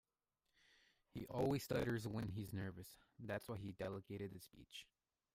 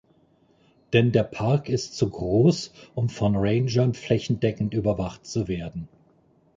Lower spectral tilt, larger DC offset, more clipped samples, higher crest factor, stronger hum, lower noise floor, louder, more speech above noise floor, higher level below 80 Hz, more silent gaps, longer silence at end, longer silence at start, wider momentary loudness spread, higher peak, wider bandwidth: about the same, -6.5 dB/octave vs -7 dB/octave; neither; neither; about the same, 18 dB vs 18 dB; neither; first, under -90 dBFS vs -61 dBFS; second, -46 LUFS vs -24 LUFS; first, over 44 dB vs 38 dB; second, -68 dBFS vs -48 dBFS; neither; second, 0.5 s vs 0.7 s; first, 1.15 s vs 0.9 s; first, 16 LU vs 10 LU; second, -30 dBFS vs -6 dBFS; first, 16 kHz vs 7.6 kHz